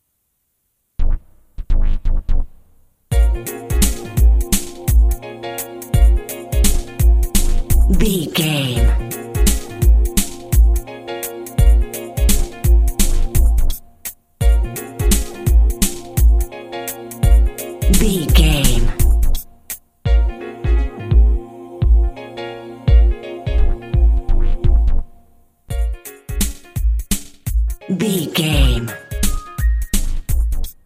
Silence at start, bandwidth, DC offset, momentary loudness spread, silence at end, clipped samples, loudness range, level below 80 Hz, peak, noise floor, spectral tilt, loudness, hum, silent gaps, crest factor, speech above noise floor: 1 s; 16 kHz; under 0.1%; 11 LU; 0.15 s; under 0.1%; 4 LU; -16 dBFS; 0 dBFS; -68 dBFS; -5 dB/octave; -18 LUFS; none; none; 14 dB; 53 dB